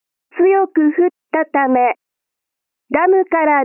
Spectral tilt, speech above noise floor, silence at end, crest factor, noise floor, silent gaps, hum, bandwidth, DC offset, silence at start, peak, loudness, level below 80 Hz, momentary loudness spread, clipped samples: -9 dB/octave; 68 dB; 0 s; 12 dB; -82 dBFS; none; none; 3 kHz; under 0.1%; 0.35 s; -2 dBFS; -15 LUFS; -64 dBFS; 7 LU; under 0.1%